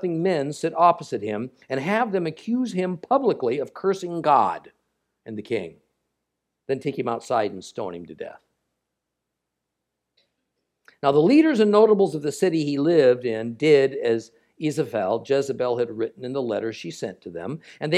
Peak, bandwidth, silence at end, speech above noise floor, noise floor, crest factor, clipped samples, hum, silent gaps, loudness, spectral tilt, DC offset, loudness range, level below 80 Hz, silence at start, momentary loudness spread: -4 dBFS; 12.5 kHz; 0 s; 59 dB; -82 dBFS; 20 dB; under 0.1%; none; none; -23 LUFS; -6.5 dB/octave; under 0.1%; 11 LU; -74 dBFS; 0 s; 16 LU